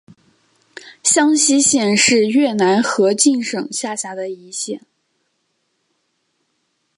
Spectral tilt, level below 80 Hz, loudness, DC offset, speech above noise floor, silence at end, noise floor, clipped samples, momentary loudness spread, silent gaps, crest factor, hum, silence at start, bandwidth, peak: -2.5 dB/octave; -68 dBFS; -15 LUFS; under 0.1%; 53 dB; 2.2 s; -69 dBFS; under 0.1%; 13 LU; none; 18 dB; none; 0.85 s; 11.5 kHz; 0 dBFS